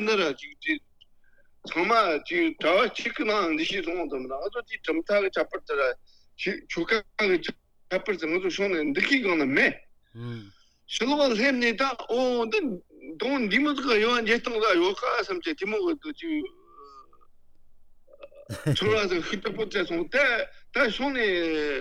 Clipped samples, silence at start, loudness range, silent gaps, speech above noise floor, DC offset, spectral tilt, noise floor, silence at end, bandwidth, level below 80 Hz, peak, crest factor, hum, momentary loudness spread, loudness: under 0.1%; 0 s; 6 LU; none; 30 dB; under 0.1%; -4.5 dB/octave; -56 dBFS; 0 s; 13 kHz; -56 dBFS; -8 dBFS; 20 dB; none; 10 LU; -26 LUFS